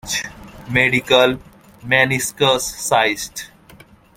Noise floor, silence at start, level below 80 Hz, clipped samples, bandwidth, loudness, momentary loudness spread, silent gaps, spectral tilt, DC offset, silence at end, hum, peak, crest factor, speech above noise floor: -46 dBFS; 0.05 s; -48 dBFS; under 0.1%; 16.5 kHz; -16 LUFS; 18 LU; none; -3 dB/octave; under 0.1%; 0.7 s; none; 0 dBFS; 18 dB; 29 dB